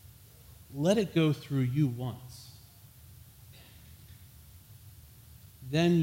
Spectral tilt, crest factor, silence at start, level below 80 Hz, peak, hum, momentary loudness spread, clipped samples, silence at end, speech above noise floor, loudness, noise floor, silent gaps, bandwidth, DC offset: -7 dB/octave; 20 dB; 0.05 s; -60 dBFS; -14 dBFS; none; 26 LU; under 0.1%; 0 s; 26 dB; -30 LUFS; -54 dBFS; none; 16.5 kHz; under 0.1%